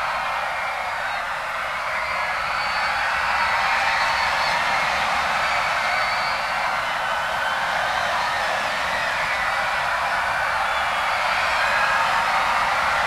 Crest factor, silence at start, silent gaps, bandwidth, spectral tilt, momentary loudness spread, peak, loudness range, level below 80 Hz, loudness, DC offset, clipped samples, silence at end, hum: 16 dB; 0 s; none; 16 kHz; -1.5 dB/octave; 5 LU; -8 dBFS; 2 LU; -48 dBFS; -21 LUFS; under 0.1%; under 0.1%; 0 s; none